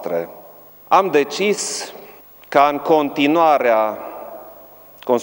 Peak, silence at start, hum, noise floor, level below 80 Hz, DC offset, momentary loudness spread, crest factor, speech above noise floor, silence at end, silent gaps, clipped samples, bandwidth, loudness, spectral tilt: 0 dBFS; 0 s; none; -43 dBFS; -66 dBFS; under 0.1%; 19 LU; 18 dB; 26 dB; 0 s; none; under 0.1%; 17 kHz; -17 LUFS; -3.5 dB/octave